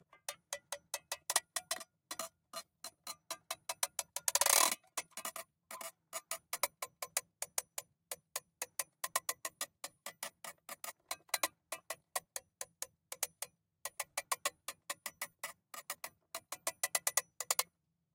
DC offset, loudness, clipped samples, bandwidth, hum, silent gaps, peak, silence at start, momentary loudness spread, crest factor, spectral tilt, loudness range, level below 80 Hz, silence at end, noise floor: under 0.1%; -39 LUFS; under 0.1%; 17 kHz; none; none; -12 dBFS; 0.3 s; 13 LU; 30 dB; 2 dB/octave; 8 LU; -88 dBFS; 0.5 s; -77 dBFS